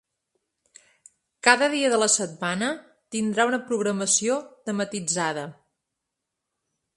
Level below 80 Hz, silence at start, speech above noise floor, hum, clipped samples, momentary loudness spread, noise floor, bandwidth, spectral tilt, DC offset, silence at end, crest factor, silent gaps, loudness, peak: -72 dBFS; 1.45 s; 59 dB; none; under 0.1%; 11 LU; -83 dBFS; 11.5 kHz; -2.5 dB/octave; under 0.1%; 1.45 s; 26 dB; none; -23 LUFS; 0 dBFS